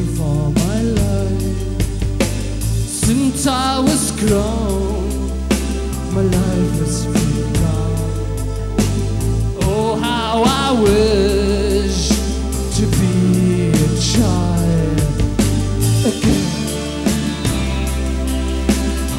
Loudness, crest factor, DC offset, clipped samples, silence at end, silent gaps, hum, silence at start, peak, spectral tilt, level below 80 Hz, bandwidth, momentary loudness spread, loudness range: -17 LUFS; 14 dB; under 0.1%; under 0.1%; 0 s; none; none; 0 s; -2 dBFS; -5.5 dB/octave; -24 dBFS; 16.5 kHz; 6 LU; 3 LU